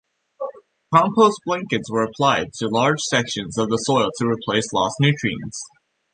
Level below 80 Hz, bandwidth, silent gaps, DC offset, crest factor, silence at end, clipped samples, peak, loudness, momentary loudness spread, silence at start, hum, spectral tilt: -56 dBFS; 10 kHz; none; under 0.1%; 18 dB; 0.45 s; under 0.1%; -2 dBFS; -20 LUFS; 15 LU; 0.4 s; none; -4.5 dB/octave